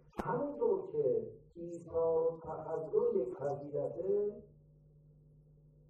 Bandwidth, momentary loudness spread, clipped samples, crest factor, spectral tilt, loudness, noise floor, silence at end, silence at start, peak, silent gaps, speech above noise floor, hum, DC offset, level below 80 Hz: 7.8 kHz; 13 LU; under 0.1%; 18 dB; -9 dB/octave; -36 LUFS; -63 dBFS; 1.4 s; 0.15 s; -18 dBFS; none; 27 dB; none; under 0.1%; -66 dBFS